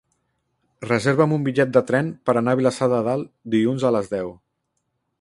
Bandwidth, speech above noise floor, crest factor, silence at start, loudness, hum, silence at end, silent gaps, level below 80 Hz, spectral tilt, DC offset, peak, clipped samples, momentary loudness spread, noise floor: 11.5 kHz; 55 dB; 18 dB; 0.8 s; -21 LUFS; none; 0.85 s; none; -60 dBFS; -7 dB/octave; under 0.1%; -4 dBFS; under 0.1%; 9 LU; -75 dBFS